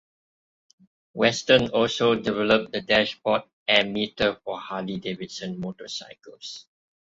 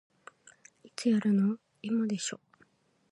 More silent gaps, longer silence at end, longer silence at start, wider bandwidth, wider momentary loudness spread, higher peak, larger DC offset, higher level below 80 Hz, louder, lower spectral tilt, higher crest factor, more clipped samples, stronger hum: first, 3.53-3.66 s vs none; second, 0.45 s vs 0.75 s; first, 1.15 s vs 1 s; second, 8 kHz vs 11.5 kHz; first, 18 LU vs 15 LU; first, -4 dBFS vs -16 dBFS; neither; first, -58 dBFS vs -82 dBFS; first, -24 LUFS vs -30 LUFS; second, -4 dB/octave vs -5.5 dB/octave; first, 22 dB vs 16 dB; neither; neither